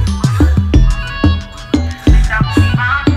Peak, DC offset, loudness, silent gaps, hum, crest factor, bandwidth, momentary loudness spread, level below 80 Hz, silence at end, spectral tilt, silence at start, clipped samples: 0 dBFS; under 0.1%; -13 LUFS; none; none; 12 dB; 13 kHz; 5 LU; -16 dBFS; 0 s; -6.5 dB/octave; 0 s; under 0.1%